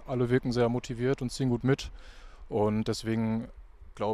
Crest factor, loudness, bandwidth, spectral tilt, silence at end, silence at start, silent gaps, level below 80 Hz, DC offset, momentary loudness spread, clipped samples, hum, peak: 16 dB; -30 LUFS; 13.5 kHz; -6.5 dB/octave; 0 s; 0 s; none; -48 dBFS; under 0.1%; 8 LU; under 0.1%; none; -14 dBFS